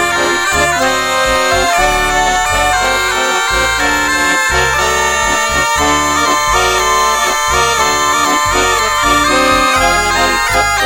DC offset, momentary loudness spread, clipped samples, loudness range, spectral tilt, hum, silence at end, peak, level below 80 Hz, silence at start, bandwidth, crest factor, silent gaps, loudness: under 0.1%; 2 LU; under 0.1%; 1 LU; -1.5 dB/octave; none; 0 s; 0 dBFS; -28 dBFS; 0 s; 17 kHz; 12 dB; none; -11 LUFS